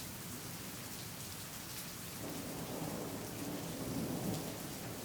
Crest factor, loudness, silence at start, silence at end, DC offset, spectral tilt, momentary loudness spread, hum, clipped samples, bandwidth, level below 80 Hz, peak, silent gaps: 16 dB; -43 LUFS; 0 s; 0 s; under 0.1%; -4 dB/octave; 5 LU; none; under 0.1%; over 20 kHz; -64 dBFS; -28 dBFS; none